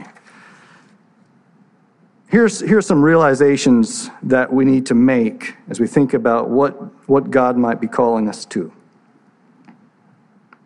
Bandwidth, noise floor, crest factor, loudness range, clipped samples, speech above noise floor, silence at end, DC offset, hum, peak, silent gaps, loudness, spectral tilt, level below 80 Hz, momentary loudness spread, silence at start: 11 kHz; -54 dBFS; 16 dB; 5 LU; under 0.1%; 39 dB; 1.95 s; under 0.1%; none; -2 dBFS; none; -15 LUFS; -6 dB/octave; -62 dBFS; 13 LU; 0 s